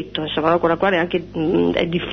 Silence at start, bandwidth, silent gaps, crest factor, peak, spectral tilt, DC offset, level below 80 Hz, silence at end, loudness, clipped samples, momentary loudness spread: 0 s; 6.4 kHz; none; 16 dB; -4 dBFS; -7.5 dB/octave; under 0.1%; -44 dBFS; 0 s; -19 LUFS; under 0.1%; 5 LU